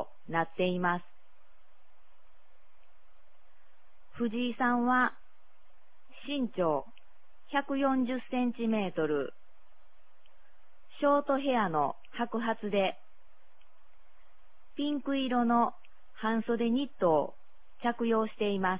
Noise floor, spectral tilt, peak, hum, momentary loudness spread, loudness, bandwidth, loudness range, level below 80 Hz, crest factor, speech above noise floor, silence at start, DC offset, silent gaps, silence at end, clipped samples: -67 dBFS; -4 dB/octave; -14 dBFS; none; 8 LU; -31 LUFS; 4 kHz; 6 LU; -68 dBFS; 18 dB; 37 dB; 0 s; 0.9%; none; 0 s; under 0.1%